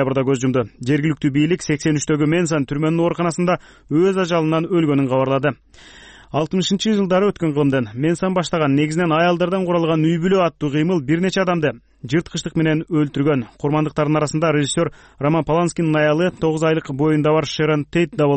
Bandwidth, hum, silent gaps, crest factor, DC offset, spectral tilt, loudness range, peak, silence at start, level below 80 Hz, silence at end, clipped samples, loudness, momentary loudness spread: 8.8 kHz; none; none; 12 dB; under 0.1%; -6 dB/octave; 2 LU; -6 dBFS; 0 s; -50 dBFS; 0 s; under 0.1%; -19 LUFS; 5 LU